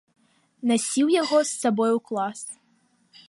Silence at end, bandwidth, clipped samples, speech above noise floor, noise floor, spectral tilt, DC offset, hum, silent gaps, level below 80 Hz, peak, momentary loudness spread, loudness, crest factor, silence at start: 0.75 s; 11.5 kHz; under 0.1%; 42 dB; -65 dBFS; -3.5 dB/octave; under 0.1%; none; none; -80 dBFS; -8 dBFS; 10 LU; -23 LUFS; 16 dB; 0.6 s